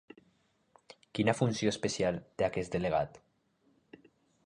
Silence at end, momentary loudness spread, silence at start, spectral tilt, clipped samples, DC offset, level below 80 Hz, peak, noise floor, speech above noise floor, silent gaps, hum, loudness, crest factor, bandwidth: 1.25 s; 5 LU; 1.15 s; -5.5 dB/octave; under 0.1%; under 0.1%; -60 dBFS; -12 dBFS; -72 dBFS; 40 dB; none; none; -33 LUFS; 22 dB; 11.5 kHz